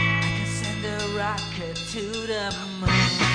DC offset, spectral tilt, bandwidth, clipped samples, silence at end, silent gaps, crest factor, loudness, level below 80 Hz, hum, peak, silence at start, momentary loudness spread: under 0.1%; -4 dB/octave; 10.5 kHz; under 0.1%; 0 s; none; 18 dB; -25 LUFS; -42 dBFS; none; -8 dBFS; 0 s; 9 LU